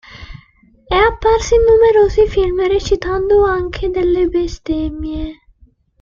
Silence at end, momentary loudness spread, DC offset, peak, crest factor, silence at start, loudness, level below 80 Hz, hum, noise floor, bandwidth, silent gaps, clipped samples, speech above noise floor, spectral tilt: 0.7 s; 13 LU; under 0.1%; -2 dBFS; 12 dB; 0.1 s; -14 LUFS; -28 dBFS; none; -51 dBFS; 7.4 kHz; none; under 0.1%; 37 dB; -5.5 dB/octave